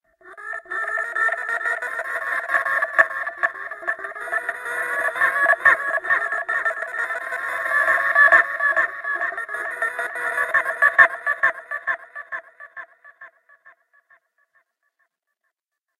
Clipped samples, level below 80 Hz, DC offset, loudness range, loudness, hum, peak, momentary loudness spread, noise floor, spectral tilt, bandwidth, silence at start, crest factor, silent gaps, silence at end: under 0.1%; -64 dBFS; under 0.1%; 5 LU; -20 LUFS; none; 0 dBFS; 14 LU; -82 dBFS; -1.5 dB/octave; 14 kHz; 0.25 s; 22 dB; none; 2.3 s